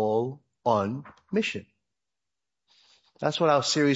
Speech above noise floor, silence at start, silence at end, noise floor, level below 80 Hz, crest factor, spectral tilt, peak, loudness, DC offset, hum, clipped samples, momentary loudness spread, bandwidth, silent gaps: 64 dB; 0 s; 0 s; -89 dBFS; -72 dBFS; 20 dB; -4.5 dB/octave; -8 dBFS; -27 LUFS; under 0.1%; none; under 0.1%; 12 LU; 8 kHz; none